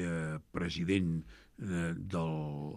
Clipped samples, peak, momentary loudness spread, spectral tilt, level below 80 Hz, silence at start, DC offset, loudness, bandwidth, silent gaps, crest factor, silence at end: under 0.1%; -18 dBFS; 8 LU; -6.5 dB/octave; -58 dBFS; 0 s; under 0.1%; -36 LUFS; 11.5 kHz; none; 18 dB; 0 s